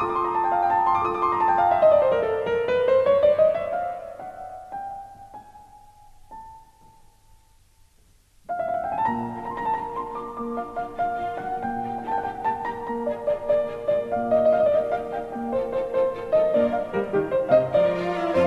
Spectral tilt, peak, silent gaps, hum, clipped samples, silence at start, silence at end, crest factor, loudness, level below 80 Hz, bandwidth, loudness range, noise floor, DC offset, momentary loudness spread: -7 dB/octave; -6 dBFS; none; none; under 0.1%; 0 s; 0 s; 18 dB; -23 LUFS; -52 dBFS; 8.4 kHz; 15 LU; -58 dBFS; under 0.1%; 16 LU